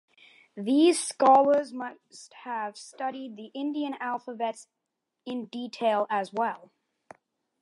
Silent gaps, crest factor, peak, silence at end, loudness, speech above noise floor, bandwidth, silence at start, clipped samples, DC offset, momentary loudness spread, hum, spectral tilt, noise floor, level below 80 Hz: none; 20 dB; -8 dBFS; 0.95 s; -27 LUFS; 57 dB; 11.5 kHz; 0.55 s; under 0.1%; under 0.1%; 23 LU; none; -3.5 dB/octave; -84 dBFS; -88 dBFS